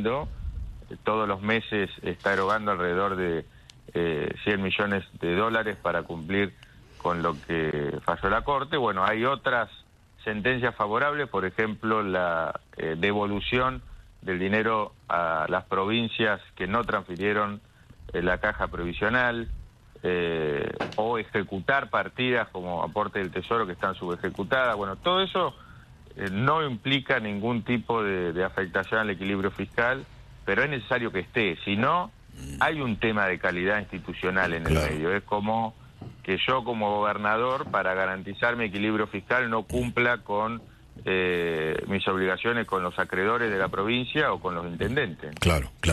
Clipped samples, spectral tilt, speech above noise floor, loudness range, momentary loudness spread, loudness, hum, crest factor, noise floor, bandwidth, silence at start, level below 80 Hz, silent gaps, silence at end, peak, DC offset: under 0.1%; -6 dB/octave; 22 dB; 2 LU; 7 LU; -27 LUFS; none; 20 dB; -49 dBFS; 13 kHz; 0 s; -48 dBFS; none; 0 s; -8 dBFS; under 0.1%